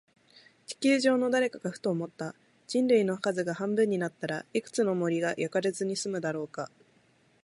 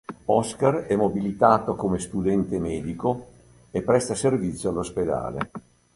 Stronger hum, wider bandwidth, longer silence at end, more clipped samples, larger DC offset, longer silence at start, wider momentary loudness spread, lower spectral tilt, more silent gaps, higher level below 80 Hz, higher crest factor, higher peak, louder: neither; about the same, 11.5 kHz vs 11.5 kHz; first, 0.8 s vs 0.35 s; neither; neither; first, 0.7 s vs 0.1 s; first, 13 LU vs 10 LU; second, -5 dB/octave vs -6.5 dB/octave; neither; second, -78 dBFS vs -48 dBFS; about the same, 18 dB vs 22 dB; second, -12 dBFS vs -2 dBFS; second, -29 LUFS vs -24 LUFS